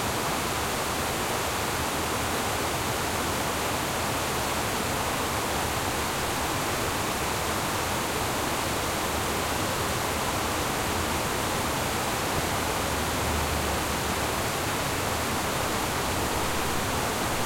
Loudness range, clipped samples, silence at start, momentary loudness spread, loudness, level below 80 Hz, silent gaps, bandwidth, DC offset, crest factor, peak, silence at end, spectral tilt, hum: 0 LU; under 0.1%; 0 s; 1 LU; -27 LUFS; -42 dBFS; none; 16.5 kHz; under 0.1%; 14 dB; -14 dBFS; 0 s; -3 dB/octave; none